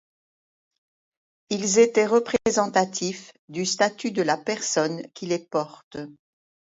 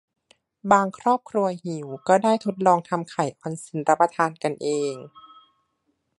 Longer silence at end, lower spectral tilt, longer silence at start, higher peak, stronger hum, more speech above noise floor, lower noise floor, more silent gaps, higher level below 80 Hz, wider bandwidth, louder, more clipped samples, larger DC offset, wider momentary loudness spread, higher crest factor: second, 0.65 s vs 1.1 s; second, -3.5 dB/octave vs -5.5 dB/octave; first, 1.5 s vs 0.65 s; second, -6 dBFS vs -2 dBFS; neither; first, over 66 dB vs 50 dB; first, under -90 dBFS vs -73 dBFS; first, 3.39-3.48 s, 5.84-5.91 s vs none; first, -64 dBFS vs -72 dBFS; second, 8 kHz vs 11.5 kHz; about the same, -23 LUFS vs -23 LUFS; neither; neither; first, 18 LU vs 12 LU; about the same, 20 dB vs 22 dB